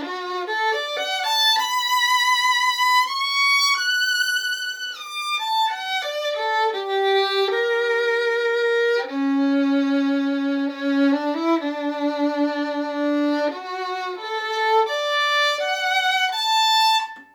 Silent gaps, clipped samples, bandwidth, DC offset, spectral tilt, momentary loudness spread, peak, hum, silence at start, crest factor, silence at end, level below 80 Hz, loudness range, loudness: none; under 0.1%; over 20 kHz; under 0.1%; 0 dB/octave; 8 LU; -8 dBFS; none; 0 s; 12 dB; 0.1 s; -86 dBFS; 5 LU; -20 LUFS